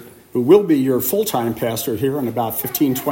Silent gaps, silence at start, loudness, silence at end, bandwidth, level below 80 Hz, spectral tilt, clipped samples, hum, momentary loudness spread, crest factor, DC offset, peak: none; 0 s; -18 LUFS; 0 s; 16.5 kHz; -56 dBFS; -5.5 dB/octave; under 0.1%; none; 8 LU; 16 dB; under 0.1%; 0 dBFS